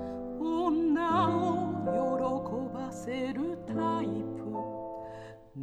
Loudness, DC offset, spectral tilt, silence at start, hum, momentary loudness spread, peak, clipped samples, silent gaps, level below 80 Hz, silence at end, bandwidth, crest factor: -32 LUFS; under 0.1%; -7 dB/octave; 0 s; none; 13 LU; -16 dBFS; under 0.1%; none; -60 dBFS; 0 s; 9.8 kHz; 16 dB